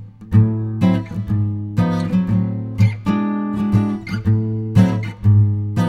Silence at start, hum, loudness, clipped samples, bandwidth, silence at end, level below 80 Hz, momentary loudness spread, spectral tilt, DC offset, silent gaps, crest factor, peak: 0 s; none; -18 LUFS; under 0.1%; 6.6 kHz; 0 s; -40 dBFS; 6 LU; -9 dB/octave; under 0.1%; none; 16 dB; 0 dBFS